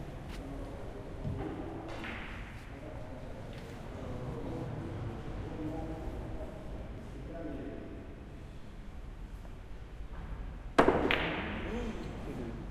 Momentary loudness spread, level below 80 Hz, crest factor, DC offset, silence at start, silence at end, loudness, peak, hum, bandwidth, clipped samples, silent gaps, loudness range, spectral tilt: 17 LU; -46 dBFS; 32 dB; under 0.1%; 0 s; 0 s; -39 LUFS; -6 dBFS; none; 13.5 kHz; under 0.1%; none; 12 LU; -6.5 dB/octave